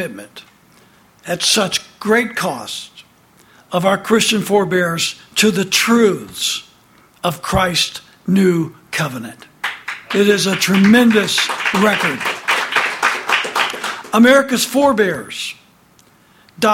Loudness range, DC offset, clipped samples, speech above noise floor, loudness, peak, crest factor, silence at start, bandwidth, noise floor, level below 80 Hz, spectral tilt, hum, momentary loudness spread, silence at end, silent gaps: 5 LU; under 0.1%; under 0.1%; 35 dB; -15 LUFS; 0 dBFS; 16 dB; 0 s; 17 kHz; -51 dBFS; -48 dBFS; -3.5 dB/octave; none; 13 LU; 0 s; none